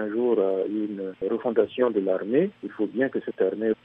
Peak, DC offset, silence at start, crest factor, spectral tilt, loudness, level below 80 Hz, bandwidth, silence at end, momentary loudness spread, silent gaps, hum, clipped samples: -8 dBFS; under 0.1%; 0 s; 16 dB; -9.5 dB/octave; -26 LUFS; -72 dBFS; 3.8 kHz; 0.1 s; 6 LU; none; none; under 0.1%